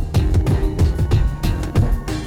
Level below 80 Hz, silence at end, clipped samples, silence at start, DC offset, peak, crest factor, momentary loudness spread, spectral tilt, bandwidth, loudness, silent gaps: -20 dBFS; 0 s; under 0.1%; 0 s; under 0.1%; -6 dBFS; 12 dB; 4 LU; -7 dB/octave; 16 kHz; -19 LUFS; none